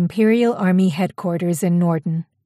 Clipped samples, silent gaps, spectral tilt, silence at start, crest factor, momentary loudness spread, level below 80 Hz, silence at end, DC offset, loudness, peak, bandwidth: under 0.1%; none; -7.5 dB/octave; 0 s; 12 dB; 7 LU; -64 dBFS; 0.25 s; under 0.1%; -19 LUFS; -6 dBFS; 15 kHz